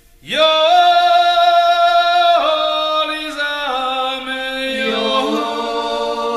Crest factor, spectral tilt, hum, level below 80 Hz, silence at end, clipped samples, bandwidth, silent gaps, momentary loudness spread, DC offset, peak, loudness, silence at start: 14 dB; -2.5 dB/octave; none; -50 dBFS; 0 s; under 0.1%; 13 kHz; none; 9 LU; under 0.1%; -2 dBFS; -15 LUFS; 0.25 s